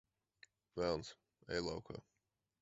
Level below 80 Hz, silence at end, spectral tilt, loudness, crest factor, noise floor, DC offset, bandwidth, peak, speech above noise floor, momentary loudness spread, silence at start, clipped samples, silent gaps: -66 dBFS; 0.6 s; -4 dB/octave; -44 LUFS; 22 dB; -70 dBFS; under 0.1%; 7.6 kHz; -24 dBFS; 28 dB; 15 LU; 0.75 s; under 0.1%; none